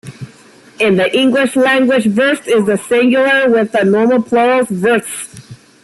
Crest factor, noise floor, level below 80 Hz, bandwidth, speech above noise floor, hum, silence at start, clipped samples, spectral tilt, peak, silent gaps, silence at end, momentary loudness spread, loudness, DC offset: 10 dB; -42 dBFS; -56 dBFS; 12.5 kHz; 30 dB; none; 0.05 s; under 0.1%; -5 dB/octave; -2 dBFS; none; 0.3 s; 6 LU; -12 LUFS; under 0.1%